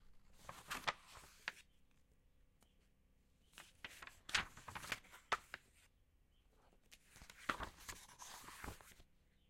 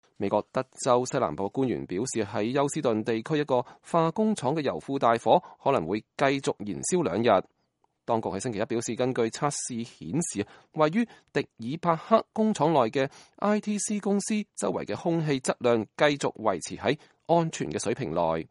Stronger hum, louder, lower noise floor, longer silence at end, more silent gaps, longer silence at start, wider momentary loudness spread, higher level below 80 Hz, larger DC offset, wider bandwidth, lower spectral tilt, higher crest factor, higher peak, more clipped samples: neither; second, -48 LUFS vs -27 LUFS; about the same, -74 dBFS vs -73 dBFS; first, 0.35 s vs 0.05 s; neither; second, 0 s vs 0.2 s; first, 22 LU vs 7 LU; about the same, -68 dBFS vs -64 dBFS; neither; first, 16.5 kHz vs 11.5 kHz; second, -1.5 dB/octave vs -5 dB/octave; first, 32 dB vs 22 dB; second, -20 dBFS vs -6 dBFS; neither